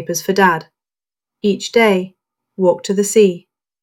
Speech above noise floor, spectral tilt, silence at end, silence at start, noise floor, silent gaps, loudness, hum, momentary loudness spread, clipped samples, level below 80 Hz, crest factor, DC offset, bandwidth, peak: over 75 dB; -4.5 dB/octave; 0.45 s; 0 s; under -90 dBFS; none; -15 LUFS; none; 9 LU; under 0.1%; -62 dBFS; 16 dB; under 0.1%; 17 kHz; 0 dBFS